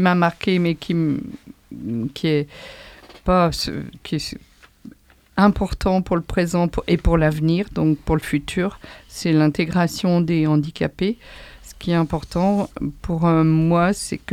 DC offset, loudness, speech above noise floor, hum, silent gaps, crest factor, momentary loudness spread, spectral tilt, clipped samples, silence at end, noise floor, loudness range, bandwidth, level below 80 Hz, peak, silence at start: under 0.1%; -20 LUFS; 26 dB; none; none; 18 dB; 16 LU; -6.5 dB/octave; under 0.1%; 0 s; -46 dBFS; 4 LU; 14.5 kHz; -36 dBFS; -2 dBFS; 0 s